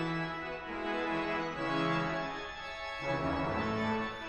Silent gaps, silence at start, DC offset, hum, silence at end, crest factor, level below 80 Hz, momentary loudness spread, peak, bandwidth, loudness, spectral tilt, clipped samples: none; 0 s; under 0.1%; none; 0 s; 14 dB; -54 dBFS; 7 LU; -20 dBFS; 11 kHz; -35 LUFS; -6 dB/octave; under 0.1%